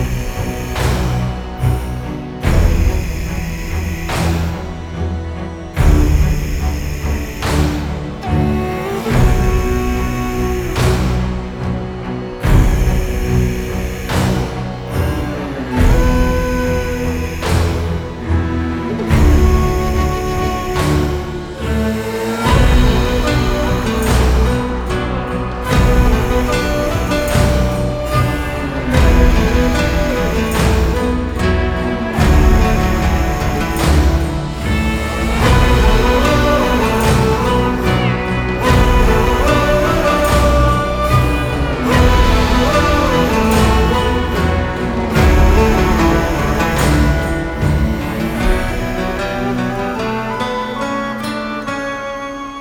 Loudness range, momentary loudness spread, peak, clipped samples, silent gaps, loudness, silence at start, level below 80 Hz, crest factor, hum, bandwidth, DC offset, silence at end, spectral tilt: 5 LU; 9 LU; -2 dBFS; under 0.1%; none; -16 LUFS; 0 s; -18 dBFS; 14 dB; none; 18 kHz; under 0.1%; 0 s; -6 dB/octave